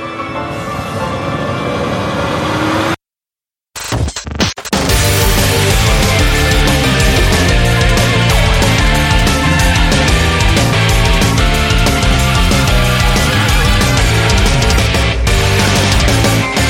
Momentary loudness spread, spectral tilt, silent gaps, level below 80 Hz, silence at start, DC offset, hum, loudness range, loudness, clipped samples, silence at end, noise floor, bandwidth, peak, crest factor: 7 LU; -4 dB/octave; none; -16 dBFS; 0 s; under 0.1%; none; 6 LU; -12 LUFS; under 0.1%; 0 s; under -90 dBFS; 16.5 kHz; 0 dBFS; 12 dB